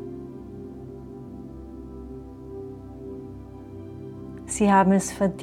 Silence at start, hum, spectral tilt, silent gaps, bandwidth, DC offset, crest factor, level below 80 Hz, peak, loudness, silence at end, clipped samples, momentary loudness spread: 0 s; none; -6 dB/octave; none; 13 kHz; under 0.1%; 22 dB; -48 dBFS; -6 dBFS; -21 LUFS; 0 s; under 0.1%; 21 LU